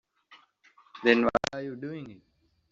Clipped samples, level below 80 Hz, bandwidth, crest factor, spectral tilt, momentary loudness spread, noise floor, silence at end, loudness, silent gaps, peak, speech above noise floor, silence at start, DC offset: under 0.1%; -60 dBFS; 7.6 kHz; 26 dB; -3 dB/octave; 18 LU; -62 dBFS; 0.55 s; -27 LUFS; none; -4 dBFS; 35 dB; 0.3 s; under 0.1%